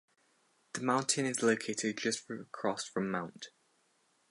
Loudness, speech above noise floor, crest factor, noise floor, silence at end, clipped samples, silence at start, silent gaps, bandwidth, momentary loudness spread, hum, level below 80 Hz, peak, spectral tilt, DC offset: -34 LUFS; 39 dB; 22 dB; -73 dBFS; 0.85 s; under 0.1%; 0.75 s; none; 11.5 kHz; 14 LU; none; -80 dBFS; -14 dBFS; -3.5 dB/octave; under 0.1%